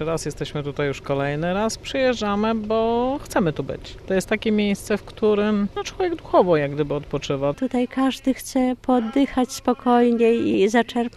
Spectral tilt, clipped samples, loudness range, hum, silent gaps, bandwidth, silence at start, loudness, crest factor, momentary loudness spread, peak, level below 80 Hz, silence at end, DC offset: -5.5 dB/octave; under 0.1%; 3 LU; none; none; 13.5 kHz; 0 s; -22 LUFS; 18 dB; 8 LU; -4 dBFS; -44 dBFS; 0.05 s; under 0.1%